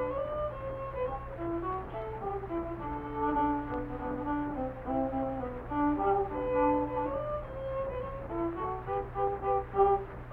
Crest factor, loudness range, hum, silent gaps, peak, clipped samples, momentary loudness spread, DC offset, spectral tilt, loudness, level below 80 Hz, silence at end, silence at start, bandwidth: 18 dB; 3 LU; none; none; -14 dBFS; under 0.1%; 9 LU; under 0.1%; -10 dB/octave; -33 LUFS; -46 dBFS; 0 s; 0 s; 4.3 kHz